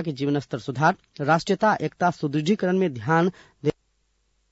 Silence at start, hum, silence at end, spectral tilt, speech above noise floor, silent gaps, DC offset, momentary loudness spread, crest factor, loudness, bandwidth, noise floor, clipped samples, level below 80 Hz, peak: 0 s; none; 0.8 s; -6.5 dB/octave; 46 dB; none; under 0.1%; 7 LU; 16 dB; -24 LUFS; 8 kHz; -69 dBFS; under 0.1%; -62 dBFS; -8 dBFS